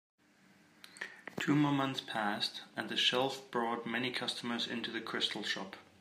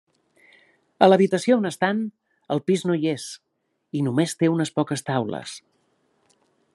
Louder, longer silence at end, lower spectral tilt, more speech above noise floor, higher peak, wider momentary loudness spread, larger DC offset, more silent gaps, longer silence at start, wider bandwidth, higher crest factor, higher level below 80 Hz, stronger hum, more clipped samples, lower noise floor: second, -35 LUFS vs -22 LUFS; second, 0.2 s vs 1.15 s; second, -4 dB/octave vs -6 dB/octave; second, 30 dB vs 46 dB; second, -14 dBFS vs -2 dBFS; about the same, 14 LU vs 16 LU; neither; neither; second, 0.85 s vs 1 s; first, 15.5 kHz vs 12.5 kHz; about the same, 22 dB vs 22 dB; second, -84 dBFS vs -72 dBFS; neither; neither; about the same, -66 dBFS vs -67 dBFS